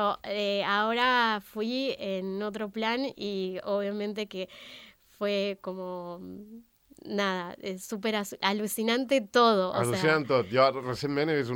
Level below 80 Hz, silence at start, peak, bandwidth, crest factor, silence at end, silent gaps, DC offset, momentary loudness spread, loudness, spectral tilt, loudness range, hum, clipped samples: -68 dBFS; 0 s; -10 dBFS; 17 kHz; 20 dB; 0 s; none; under 0.1%; 14 LU; -29 LUFS; -4.5 dB/octave; 8 LU; none; under 0.1%